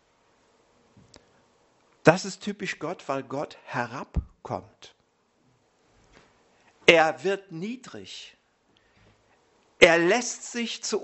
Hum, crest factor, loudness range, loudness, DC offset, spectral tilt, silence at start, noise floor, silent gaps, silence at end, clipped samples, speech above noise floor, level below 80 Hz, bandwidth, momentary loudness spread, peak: none; 28 dB; 10 LU; -25 LUFS; under 0.1%; -3.5 dB/octave; 2.05 s; -68 dBFS; none; 0 s; under 0.1%; 41 dB; -48 dBFS; 8.2 kHz; 19 LU; 0 dBFS